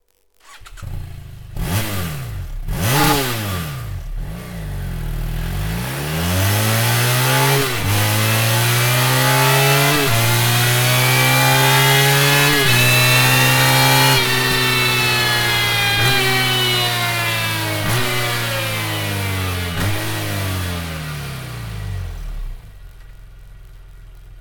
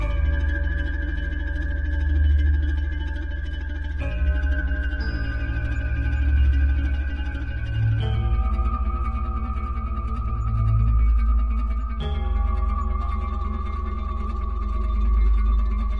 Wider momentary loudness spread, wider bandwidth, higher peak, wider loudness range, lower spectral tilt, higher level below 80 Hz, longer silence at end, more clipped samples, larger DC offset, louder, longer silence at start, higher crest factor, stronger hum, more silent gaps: first, 17 LU vs 8 LU; first, 19.5 kHz vs 5.4 kHz; first, 0 dBFS vs -10 dBFS; first, 12 LU vs 3 LU; second, -3.5 dB/octave vs -8.5 dB/octave; second, -34 dBFS vs -22 dBFS; about the same, 0 s vs 0 s; neither; neither; first, -15 LUFS vs -25 LUFS; first, 0.5 s vs 0 s; about the same, 16 dB vs 12 dB; neither; neither